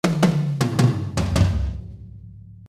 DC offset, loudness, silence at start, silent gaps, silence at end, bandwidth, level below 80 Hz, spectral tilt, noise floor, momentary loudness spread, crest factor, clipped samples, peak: under 0.1%; -21 LUFS; 0.05 s; none; 0 s; 15.5 kHz; -32 dBFS; -6.5 dB/octave; -41 dBFS; 21 LU; 18 dB; under 0.1%; -4 dBFS